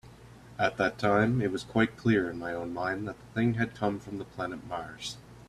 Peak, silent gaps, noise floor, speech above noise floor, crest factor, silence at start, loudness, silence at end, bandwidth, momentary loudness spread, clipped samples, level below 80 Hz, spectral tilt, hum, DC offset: -10 dBFS; none; -51 dBFS; 21 dB; 20 dB; 0.05 s; -30 LUFS; 0.05 s; 13 kHz; 13 LU; under 0.1%; -58 dBFS; -6.5 dB/octave; none; under 0.1%